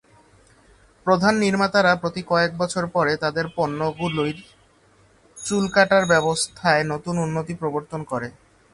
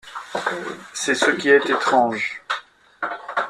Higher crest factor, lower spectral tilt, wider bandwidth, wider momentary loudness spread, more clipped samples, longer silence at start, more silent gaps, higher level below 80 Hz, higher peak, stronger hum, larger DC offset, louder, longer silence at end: about the same, 20 dB vs 20 dB; first, -4.5 dB/octave vs -2.5 dB/octave; second, 11.5 kHz vs 13 kHz; about the same, 12 LU vs 14 LU; neither; first, 1.05 s vs 0.05 s; neither; first, -54 dBFS vs -68 dBFS; about the same, -2 dBFS vs -2 dBFS; neither; neither; about the same, -21 LUFS vs -21 LUFS; first, 0.45 s vs 0 s